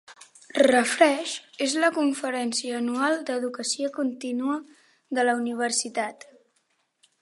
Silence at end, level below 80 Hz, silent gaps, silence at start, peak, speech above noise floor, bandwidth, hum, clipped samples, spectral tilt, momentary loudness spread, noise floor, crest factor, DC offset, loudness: 1.1 s; -78 dBFS; none; 0.1 s; -4 dBFS; 46 dB; 11.5 kHz; none; under 0.1%; -2 dB/octave; 10 LU; -71 dBFS; 22 dB; under 0.1%; -25 LUFS